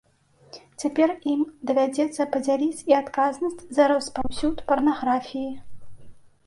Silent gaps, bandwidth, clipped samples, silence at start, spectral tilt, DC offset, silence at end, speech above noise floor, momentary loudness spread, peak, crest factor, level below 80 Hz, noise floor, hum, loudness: none; 11.5 kHz; under 0.1%; 0.55 s; -4.5 dB/octave; under 0.1%; 0.25 s; 35 dB; 10 LU; -6 dBFS; 18 dB; -52 dBFS; -58 dBFS; none; -24 LUFS